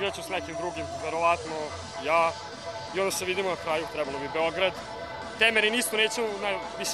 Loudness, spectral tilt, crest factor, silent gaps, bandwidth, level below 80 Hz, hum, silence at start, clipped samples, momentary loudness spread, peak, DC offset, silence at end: -28 LUFS; -2.5 dB/octave; 20 dB; none; 15 kHz; -58 dBFS; none; 0 s; under 0.1%; 13 LU; -8 dBFS; under 0.1%; 0 s